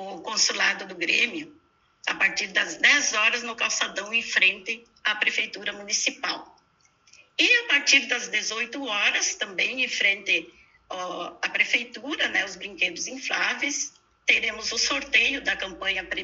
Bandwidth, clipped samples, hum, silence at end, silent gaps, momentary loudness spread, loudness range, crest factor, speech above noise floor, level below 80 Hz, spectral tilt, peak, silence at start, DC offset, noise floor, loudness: 8 kHz; under 0.1%; none; 0 s; none; 12 LU; 4 LU; 22 dB; 38 dB; -64 dBFS; 0.5 dB/octave; -6 dBFS; 0 s; under 0.1%; -63 dBFS; -23 LUFS